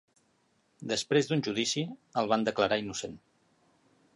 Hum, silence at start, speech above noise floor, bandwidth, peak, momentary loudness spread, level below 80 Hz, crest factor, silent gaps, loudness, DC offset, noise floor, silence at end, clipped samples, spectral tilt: none; 0.8 s; 41 dB; 11.5 kHz; -12 dBFS; 11 LU; -68 dBFS; 20 dB; none; -30 LUFS; under 0.1%; -71 dBFS; 1 s; under 0.1%; -4 dB/octave